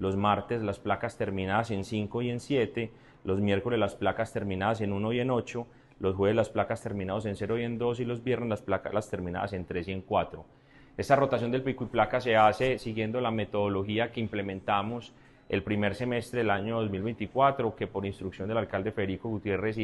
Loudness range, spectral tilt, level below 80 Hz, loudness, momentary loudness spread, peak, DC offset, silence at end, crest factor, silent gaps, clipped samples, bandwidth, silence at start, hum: 4 LU; -7 dB/octave; -56 dBFS; -30 LUFS; 8 LU; -8 dBFS; under 0.1%; 0 s; 22 dB; none; under 0.1%; 12 kHz; 0 s; none